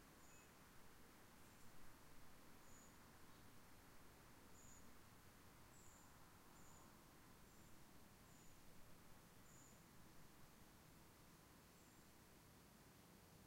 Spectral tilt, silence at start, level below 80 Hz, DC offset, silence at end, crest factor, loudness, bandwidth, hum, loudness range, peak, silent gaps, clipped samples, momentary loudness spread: -3.5 dB/octave; 0 s; -76 dBFS; under 0.1%; 0 s; 16 dB; -67 LUFS; 16 kHz; none; 1 LU; -48 dBFS; none; under 0.1%; 2 LU